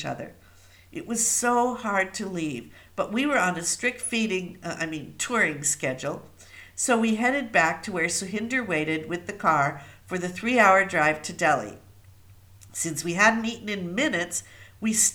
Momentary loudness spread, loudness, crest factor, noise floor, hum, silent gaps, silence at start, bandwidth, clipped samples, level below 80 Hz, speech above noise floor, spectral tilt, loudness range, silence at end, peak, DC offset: 14 LU; -25 LUFS; 22 dB; -53 dBFS; none; none; 0 s; over 20 kHz; under 0.1%; -60 dBFS; 27 dB; -3 dB/octave; 4 LU; 0 s; -4 dBFS; under 0.1%